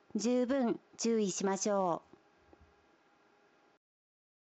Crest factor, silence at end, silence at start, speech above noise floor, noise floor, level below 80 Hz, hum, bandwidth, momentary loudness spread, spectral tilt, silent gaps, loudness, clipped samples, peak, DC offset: 16 dB; 2.45 s; 0.15 s; 36 dB; -68 dBFS; -78 dBFS; none; 8.8 kHz; 5 LU; -4.5 dB/octave; none; -33 LUFS; under 0.1%; -20 dBFS; under 0.1%